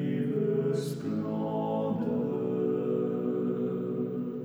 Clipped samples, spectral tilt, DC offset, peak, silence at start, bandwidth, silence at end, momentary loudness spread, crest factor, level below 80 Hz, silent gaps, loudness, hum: under 0.1%; -8.5 dB/octave; under 0.1%; -18 dBFS; 0 s; over 20 kHz; 0 s; 4 LU; 12 dB; -70 dBFS; none; -31 LUFS; none